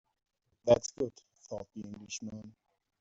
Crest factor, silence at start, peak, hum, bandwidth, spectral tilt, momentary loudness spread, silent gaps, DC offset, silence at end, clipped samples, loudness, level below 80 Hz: 24 dB; 0.65 s; -12 dBFS; none; 8 kHz; -5.5 dB/octave; 18 LU; none; under 0.1%; 0.5 s; under 0.1%; -33 LUFS; -66 dBFS